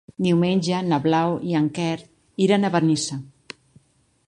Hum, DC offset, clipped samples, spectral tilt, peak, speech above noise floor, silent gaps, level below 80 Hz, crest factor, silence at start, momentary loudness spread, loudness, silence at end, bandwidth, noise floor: none; under 0.1%; under 0.1%; -6 dB/octave; -4 dBFS; 40 dB; none; -62 dBFS; 18 dB; 0.2 s; 20 LU; -21 LUFS; 1 s; 11 kHz; -61 dBFS